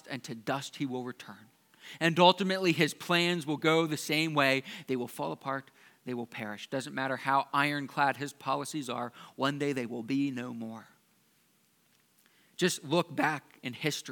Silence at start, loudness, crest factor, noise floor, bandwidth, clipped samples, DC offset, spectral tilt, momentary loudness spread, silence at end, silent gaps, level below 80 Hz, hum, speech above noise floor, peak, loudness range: 0.05 s; -31 LUFS; 26 dB; -69 dBFS; 19 kHz; under 0.1%; under 0.1%; -4.5 dB/octave; 13 LU; 0 s; none; -86 dBFS; none; 38 dB; -6 dBFS; 9 LU